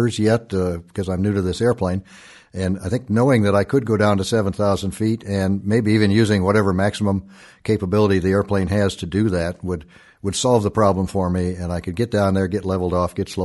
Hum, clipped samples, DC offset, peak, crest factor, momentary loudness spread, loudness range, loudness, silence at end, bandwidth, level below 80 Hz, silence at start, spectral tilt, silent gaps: none; under 0.1%; under 0.1%; -2 dBFS; 16 dB; 9 LU; 2 LU; -20 LUFS; 0 s; 11.5 kHz; -44 dBFS; 0 s; -6.5 dB/octave; none